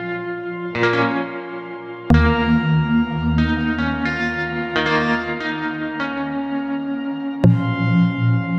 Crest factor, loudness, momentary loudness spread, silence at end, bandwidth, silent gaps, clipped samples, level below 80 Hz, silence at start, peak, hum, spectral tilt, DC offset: 20 dB; -20 LUFS; 10 LU; 0 s; 7.4 kHz; none; under 0.1%; -32 dBFS; 0 s; 0 dBFS; none; -8 dB/octave; under 0.1%